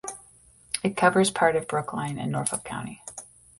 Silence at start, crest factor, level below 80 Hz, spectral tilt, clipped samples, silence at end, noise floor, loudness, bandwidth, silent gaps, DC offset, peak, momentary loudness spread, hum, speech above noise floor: 0.05 s; 22 dB; -60 dBFS; -4 dB/octave; under 0.1%; 0.35 s; -55 dBFS; -25 LUFS; 12 kHz; none; under 0.1%; -6 dBFS; 19 LU; none; 30 dB